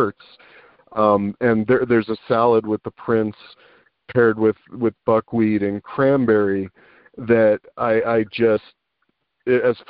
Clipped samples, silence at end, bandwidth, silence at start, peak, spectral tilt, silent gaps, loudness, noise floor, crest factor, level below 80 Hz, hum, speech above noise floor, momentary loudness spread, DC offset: under 0.1%; 0.15 s; 5.2 kHz; 0 s; -4 dBFS; -6 dB/octave; none; -19 LUFS; -71 dBFS; 16 dB; -56 dBFS; none; 52 dB; 8 LU; under 0.1%